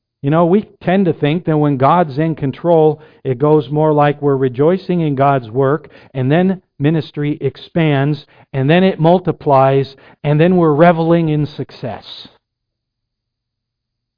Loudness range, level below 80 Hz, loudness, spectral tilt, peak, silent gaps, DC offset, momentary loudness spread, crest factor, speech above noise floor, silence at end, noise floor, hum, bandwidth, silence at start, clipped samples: 4 LU; -50 dBFS; -14 LUFS; -10.5 dB/octave; 0 dBFS; none; under 0.1%; 13 LU; 14 dB; 64 dB; 1.95 s; -77 dBFS; none; 5.2 kHz; 0.25 s; under 0.1%